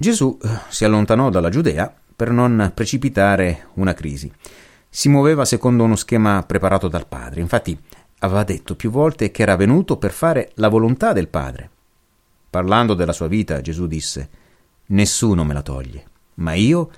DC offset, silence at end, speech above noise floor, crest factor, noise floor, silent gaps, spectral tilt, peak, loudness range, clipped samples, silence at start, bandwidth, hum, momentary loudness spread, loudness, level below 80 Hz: under 0.1%; 0.1 s; 43 dB; 16 dB; -60 dBFS; none; -6 dB/octave; -2 dBFS; 4 LU; under 0.1%; 0 s; 16.5 kHz; none; 12 LU; -18 LUFS; -36 dBFS